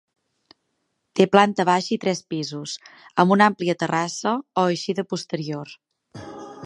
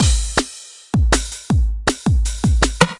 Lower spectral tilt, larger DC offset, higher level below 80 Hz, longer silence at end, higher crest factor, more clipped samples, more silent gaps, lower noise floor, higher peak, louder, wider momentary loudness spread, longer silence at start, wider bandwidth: about the same, -5 dB/octave vs -4.5 dB/octave; neither; second, -68 dBFS vs -20 dBFS; about the same, 0 s vs 0.05 s; about the same, 22 dB vs 18 dB; neither; neither; first, -74 dBFS vs -37 dBFS; about the same, -2 dBFS vs 0 dBFS; second, -22 LUFS vs -19 LUFS; first, 19 LU vs 6 LU; first, 1.15 s vs 0 s; about the same, 11.5 kHz vs 11.5 kHz